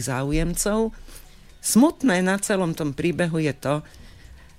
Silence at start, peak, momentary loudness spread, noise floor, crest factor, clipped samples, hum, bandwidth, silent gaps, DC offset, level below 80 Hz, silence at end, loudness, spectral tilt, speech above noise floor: 0 s; -6 dBFS; 9 LU; -46 dBFS; 16 dB; under 0.1%; none; 16 kHz; none; 0.2%; -38 dBFS; 0.25 s; -23 LUFS; -5 dB/octave; 24 dB